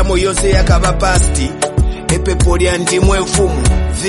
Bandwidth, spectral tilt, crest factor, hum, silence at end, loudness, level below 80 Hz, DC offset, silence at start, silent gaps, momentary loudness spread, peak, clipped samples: 11.5 kHz; -4.5 dB/octave; 12 dB; none; 0 s; -13 LUFS; -16 dBFS; under 0.1%; 0 s; none; 4 LU; 0 dBFS; under 0.1%